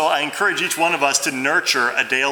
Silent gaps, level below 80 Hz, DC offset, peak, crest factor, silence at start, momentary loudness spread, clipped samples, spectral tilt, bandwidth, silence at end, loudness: none; -72 dBFS; under 0.1%; -2 dBFS; 16 dB; 0 s; 2 LU; under 0.1%; -1 dB/octave; over 20 kHz; 0 s; -18 LUFS